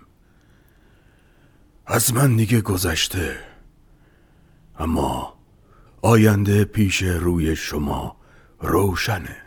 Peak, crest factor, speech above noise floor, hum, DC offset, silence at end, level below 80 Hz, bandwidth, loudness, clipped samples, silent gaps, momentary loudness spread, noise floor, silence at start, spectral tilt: -2 dBFS; 20 dB; 35 dB; none; under 0.1%; 0.05 s; -38 dBFS; over 20 kHz; -20 LUFS; under 0.1%; none; 13 LU; -55 dBFS; 1.85 s; -5 dB/octave